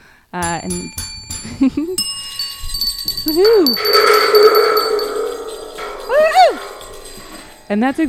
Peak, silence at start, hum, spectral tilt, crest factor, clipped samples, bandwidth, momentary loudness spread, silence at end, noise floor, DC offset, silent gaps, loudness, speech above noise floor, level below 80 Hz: 0 dBFS; 0.35 s; none; -3 dB/octave; 16 dB; under 0.1%; 16.5 kHz; 19 LU; 0 s; -36 dBFS; under 0.1%; none; -14 LUFS; 22 dB; -38 dBFS